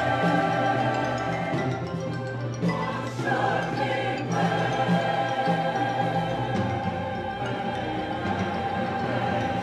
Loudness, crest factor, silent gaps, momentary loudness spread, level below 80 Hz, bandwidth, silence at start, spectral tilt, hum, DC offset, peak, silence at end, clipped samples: -26 LUFS; 16 dB; none; 6 LU; -54 dBFS; 11.5 kHz; 0 s; -6.5 dB/octave; none; under 0.1%; -10 dBFS; 0 s; under 0.1%